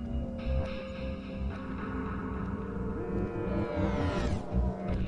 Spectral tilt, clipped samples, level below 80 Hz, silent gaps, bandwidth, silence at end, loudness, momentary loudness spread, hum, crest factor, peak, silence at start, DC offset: -8 dB/octave; under 0.1%; -38 dBFS; none; 9.6 kHz; 0 s; -34 LUFS; 6 LU; none; 16 dB; -16 dBFS; 0 s; under 0.1%